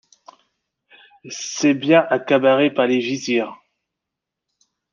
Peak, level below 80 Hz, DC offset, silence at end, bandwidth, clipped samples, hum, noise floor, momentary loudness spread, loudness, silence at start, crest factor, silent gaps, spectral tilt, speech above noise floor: -2 dBFS; -72 dBFS; under 0.1%; 1.4 s; 7.4 kHz; under 0.1%; none; -83 dBFS; 14 LU; -18 LUFS; 1.25 s; 18 dB; none; -4.5 dB/octave; 66 dB